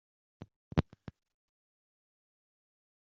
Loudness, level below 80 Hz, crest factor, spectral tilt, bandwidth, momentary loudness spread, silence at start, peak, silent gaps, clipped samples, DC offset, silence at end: -36 LUFS; -56 dBFS; 32 dB; -7 dB/octave; 7 kHz; 22 LU; 0.4 s; -10 dBFS; 0.56-0.71 s; under 0.1%; under 0.1%; 2.05 s